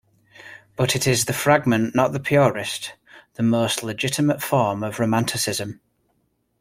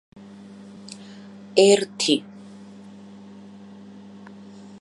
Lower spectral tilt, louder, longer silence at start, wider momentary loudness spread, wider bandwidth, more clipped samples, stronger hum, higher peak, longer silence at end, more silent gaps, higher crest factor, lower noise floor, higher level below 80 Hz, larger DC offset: about the same, -4.5 dB/octave vs -3.5 dB/octave; about the same, -21 LUFS vs -19 LUFS; second, 0.4 s vs 1.55 s; second, 15 LU vs 27 LU; first, 16.5 kHz vs 11.5 kHz; neither; neither; about the same, -2 dBFS vs -2 dBFS; second, 0.85 s vs 2.6 s; neither; about the same, 20 dB vs 24 dB; first, -69 dBFS vs -43 dBFS; first, -56 dBFS vs -74 dBFS; neither